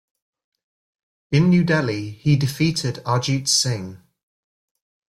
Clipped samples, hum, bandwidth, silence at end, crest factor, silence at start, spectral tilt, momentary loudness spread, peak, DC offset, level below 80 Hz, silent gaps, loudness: under 0.1%; none; 15 kHz; 1.15 s; 16 dB; 1.3 s; -4.5 dB/octave; 8 LU; -6 dBFS; under 0.1%; -54 dBFS; none; -20 LUFS